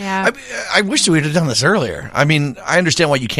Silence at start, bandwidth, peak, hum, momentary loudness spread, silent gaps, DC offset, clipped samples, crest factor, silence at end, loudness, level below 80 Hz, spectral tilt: 0 s; 15 kHz; 0 dBFS; none; 5 LU; none; under 0.1%; under 0.1%; 16 dB; 0 s; -15 LUFS; -46 dBFS; -4 dB/octave